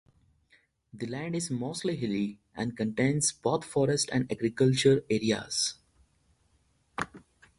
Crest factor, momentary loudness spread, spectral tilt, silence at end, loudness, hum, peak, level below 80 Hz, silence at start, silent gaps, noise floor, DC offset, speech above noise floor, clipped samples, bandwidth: 20 dB; 13 LU; -4.5 dB/octave; 0.4 s; -29 LUFS; none; -10 dBFS; -62 dBFS; 0.95 s; none; -69 dBFS; under 0.1%; 41 dB; under 0.1%; 11.5 kHz